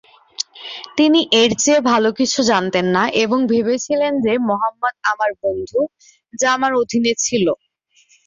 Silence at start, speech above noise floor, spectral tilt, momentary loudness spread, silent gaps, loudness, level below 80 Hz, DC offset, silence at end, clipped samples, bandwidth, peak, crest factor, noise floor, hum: 0.4 s; 40 dB; -3 dB/octave; 11 LU; none; -17 LUFS; -56 dBFS; under 0.1%; 0.7 s; under 0.1%; 7.8 kHz; -2 dBFS; 16 dB; -56 dBFS; none